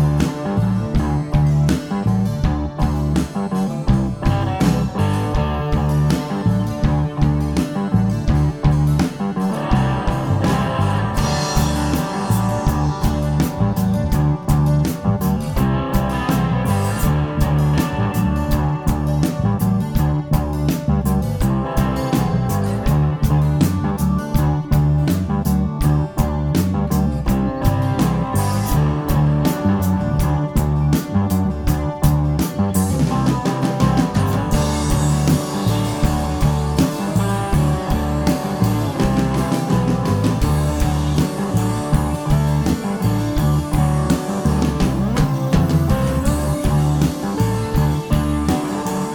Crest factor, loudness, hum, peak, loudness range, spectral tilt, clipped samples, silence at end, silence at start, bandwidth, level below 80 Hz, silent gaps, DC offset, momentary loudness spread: 16 dB; -19 LUFS; none; -2 dBFS; 1 LU; -7 dB/octave; under 0.1%; 0 s; 0 s; 19 kHz; -26 dBFS; none; under 0.1%; 3 LU